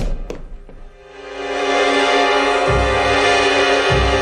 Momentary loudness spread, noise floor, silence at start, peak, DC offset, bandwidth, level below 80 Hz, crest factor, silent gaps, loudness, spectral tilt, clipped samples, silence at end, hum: 17 LU; -37 dBFS; 0 s; -4 dBFS; under 0.1%; 10.5 kHz; -28 dBFS; 14 dB; none; -15 LUFS; -4 dB/octave; under 0.1%; 0 s; none